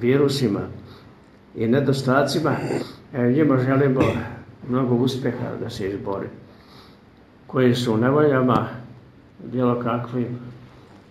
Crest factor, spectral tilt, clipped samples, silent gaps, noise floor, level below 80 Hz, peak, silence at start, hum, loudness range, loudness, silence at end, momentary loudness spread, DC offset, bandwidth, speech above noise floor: 18 dB; -7 dB/octave; under 0.1%; none; -50 dBFS; -54 dBFS; -4 dBFS; 0 s; none; 4 LU; -22 LUFS; 0.3 s; 17 LU; under 0.1%; 13 kHz; 29 dB